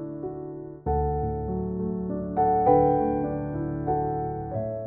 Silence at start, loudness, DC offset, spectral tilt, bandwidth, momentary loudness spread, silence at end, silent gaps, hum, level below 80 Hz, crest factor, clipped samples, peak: 0 s; -26 LUFS; under 0.1%; -11.5 dB/octave; 3.4 kHz; 14 LU; 0 s; none; none; -40 dBFS; 20 dB; under 0.1%; -6 dBFS